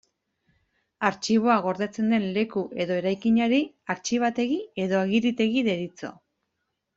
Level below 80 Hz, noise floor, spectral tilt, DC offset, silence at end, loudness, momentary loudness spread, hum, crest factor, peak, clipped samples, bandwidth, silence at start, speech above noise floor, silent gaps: -66 dBFS; -79 dBFS; -5 dB/octave; under 0.1%; 0.85 s; -25 LUFS; 9 LU; none; 20 dB; -6 dBFS; under 0.1%; 7.8 kHz; 1 s; 55 dB; none